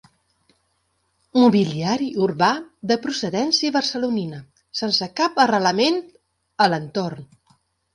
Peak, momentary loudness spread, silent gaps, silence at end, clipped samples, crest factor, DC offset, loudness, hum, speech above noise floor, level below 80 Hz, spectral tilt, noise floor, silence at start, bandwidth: -4 dBFS; 11 LU; none; 0.7 s; under 0.1%; 18 dB; under 0.1%; -20 LUFS; none; 49 dB; -64 dBFS; -4.5 dB/octave; -69 dBFS; 1.35 s; 11 kHz